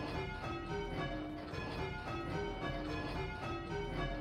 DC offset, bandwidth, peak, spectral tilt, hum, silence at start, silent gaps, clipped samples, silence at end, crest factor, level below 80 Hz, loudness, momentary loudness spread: under 0.1%; 14 kHz; -26 dBFS; -6.5 dB/octave; none; 0 s; none; under 0.1%; 0 s; 14 dB; -50 dBFS; -41 LUFS; 2 LU